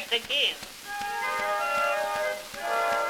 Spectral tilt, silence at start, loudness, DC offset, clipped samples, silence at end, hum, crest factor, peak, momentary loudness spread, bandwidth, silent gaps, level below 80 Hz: -0.5 dB/octave; 0 s; -28 LUFS; under 0.1%; under 0.1%; 0 s; none; 18 dB; -12 dBFS; 9 LU; 18 kHz; none; -60 dBFS